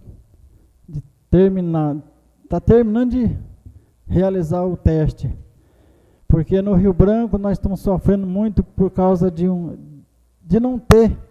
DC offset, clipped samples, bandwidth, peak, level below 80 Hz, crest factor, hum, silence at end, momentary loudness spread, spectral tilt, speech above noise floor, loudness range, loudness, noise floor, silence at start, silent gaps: under 0.1%; under 0.1%; 14.5 kHz; 0 dBFS; -30 dBFS; 18 dB; none; 0.1 s; 15 LU; -9 dB/octave; 36 dB; 3 LU; -17 LUFS; -52 dBFS; 0.05 s; none